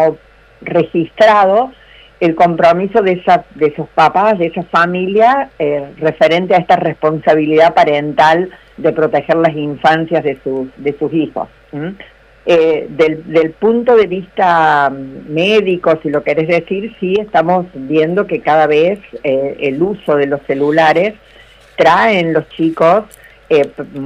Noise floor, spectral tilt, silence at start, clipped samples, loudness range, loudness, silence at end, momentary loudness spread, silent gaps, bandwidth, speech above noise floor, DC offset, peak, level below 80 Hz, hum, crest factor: -42 dBFS; -6.5 dB/octave; 0 s; under 0.1%; 4 LU; -12 LUFS; 0 s; 9 LU; none; 10 kHz; 30 dB; under 0.1%; 0 dBFS; -48 dBFS; none; 12 dB